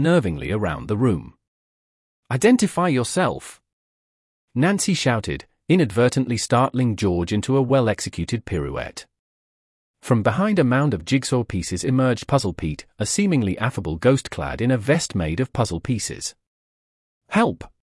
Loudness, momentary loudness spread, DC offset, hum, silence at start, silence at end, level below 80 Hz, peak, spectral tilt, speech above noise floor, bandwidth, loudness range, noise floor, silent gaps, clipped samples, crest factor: -21 LUFS; 10 LU; under 0.1%; none; 0 s; 0.3 s; -46 dBFS; -4 dBFS; -5.5 dB/octave; over 69 dB; 12 kHz; 3 LU; under -90 dBFS; 1.48-2.23 s, 3.73-4.48 s, 9.19-9.94 s, 16.47-17.21 s; under 0.1%; 18 dB